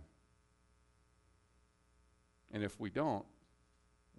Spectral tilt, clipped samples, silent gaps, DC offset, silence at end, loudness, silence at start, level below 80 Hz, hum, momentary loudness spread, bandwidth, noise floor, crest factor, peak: -6.5 dB/octave; under 0.1%; none; under 0.1%; 0.9 s; -41 LUFS; 0 s; -72 dBFS; 60 Hz at -75 dBFS; 11 LU; 11.5 kHz; -73 dBFS; 22 dB; -24 dBFS